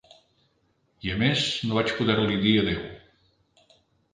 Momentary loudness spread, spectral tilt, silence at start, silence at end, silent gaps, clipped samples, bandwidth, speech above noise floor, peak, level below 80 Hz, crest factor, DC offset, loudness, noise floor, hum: 11 LU; -5.5 dB/octave; 1.05 s; 1.15 s; none; under 0.1%; 9.6 kHz; 45 dB; -8 dBFS; -50 dBFS; 20 dB; under 0.1%; -24 LUFS; -69 dBFS; none